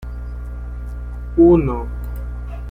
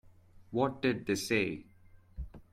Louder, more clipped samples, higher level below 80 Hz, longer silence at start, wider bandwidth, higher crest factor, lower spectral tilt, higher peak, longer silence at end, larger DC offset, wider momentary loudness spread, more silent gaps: first, -17 LUFS vs -33 LUFS; neither; first, -26 dBFS vs -54 dBFS; about the same, 0 s vs 0.1 s; second, 3.3 kHz vs 15.5 kHz; about the same, 16 dB vs 20 dB; first, -11 dB/octave vs -5 dB/octave; first, -2 dBFS vs -16 dBFS; about the same, 0 s vs 0.1 s; neither; about the same, 18 LU vs 17 LU; neither